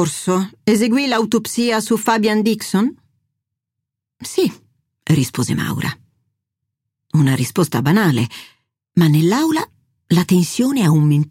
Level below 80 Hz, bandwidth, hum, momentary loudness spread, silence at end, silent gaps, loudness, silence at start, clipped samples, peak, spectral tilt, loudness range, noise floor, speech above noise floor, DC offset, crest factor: -58 dBFS; 16.5 kHz; none; 8 LU; 0.05 s; none; -17 LUFS; 0 s; under 0.1%; -2 dBFS; -5.5 dB/octave; 6 LU; -81 dBFS; 65 dB; under 0.1%; 16 dB